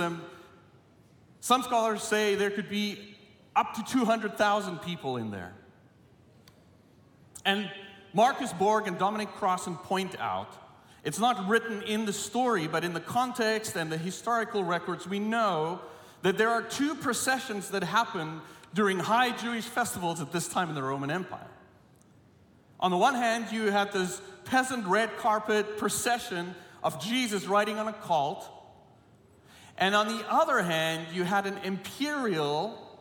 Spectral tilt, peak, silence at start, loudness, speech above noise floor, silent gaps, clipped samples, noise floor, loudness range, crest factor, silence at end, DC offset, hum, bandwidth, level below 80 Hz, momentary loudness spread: -4 dB/octave; -8 dBFS; 0 s; -29 LUFS; 30 dB; none; under 0.1%; -59 dBFS; 3 LU; 22 dB; 0 s; under 0.1%; none; 18 kHz; -72 dBFS; 10 LU